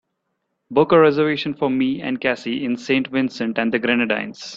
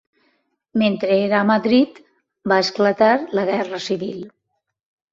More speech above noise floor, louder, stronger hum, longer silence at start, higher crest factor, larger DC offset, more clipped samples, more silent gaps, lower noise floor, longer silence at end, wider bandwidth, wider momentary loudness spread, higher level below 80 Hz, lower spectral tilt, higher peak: about the same, 55 dB vs 57 dB; about the same, -19 LUFS vs -19 LUFS; neither; about the same, 0.7 s vs 0.75 s; about the same, 18 dB vs 18 dB; neither; neither; neither; about the same, -74 dBFS vs -75 dBFS; second, 0 s vs 0.85 s; about the same, 7.6 kHz vs 7.6 kHz; second, 9 LU vs 12 LU; about the same, -60 dBFS vs -62 dBFS; about the same, -6 dB/octave vs -5.5 dB/octave; about the same, -2 dBFS vs -2 dBFS